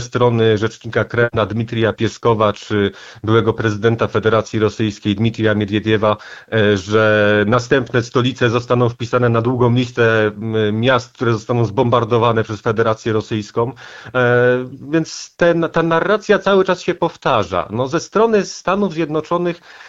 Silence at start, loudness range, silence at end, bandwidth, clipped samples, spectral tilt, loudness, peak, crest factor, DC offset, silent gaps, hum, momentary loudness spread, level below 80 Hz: 0 s; 2 LU; 0 s; 7.8 kHz; under 0.1%; -6.5 dB/octave; -16 LUFS; -2 dBFS; 14 dB; under 0.1%; none; none; 6 LU; -50 dBFS